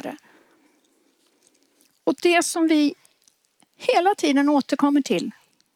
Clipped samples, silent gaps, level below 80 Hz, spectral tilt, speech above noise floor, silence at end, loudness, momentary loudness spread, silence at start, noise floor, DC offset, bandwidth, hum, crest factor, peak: under 0.1%; none; -78 dBFS; -3.5 dB/octave; 44 dB; 0.45 s; -21 LUFS; 9 LU; 0.05 s; -64 dBFS; under 0.1%; 16 kHz; none; 18 dB; -6 dBFS